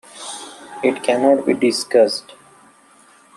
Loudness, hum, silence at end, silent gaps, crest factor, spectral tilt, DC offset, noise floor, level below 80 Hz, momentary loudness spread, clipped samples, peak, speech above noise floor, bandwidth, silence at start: -17 LUFS; none; 1.15 s; none; 18 dB; -3.5 dB/octave; under 0.1%; -50 dBFS; -70 dBFS; 16 LU; under 0.1%; -2 dBFS; 34 dB; 13 kHz; 0.15 s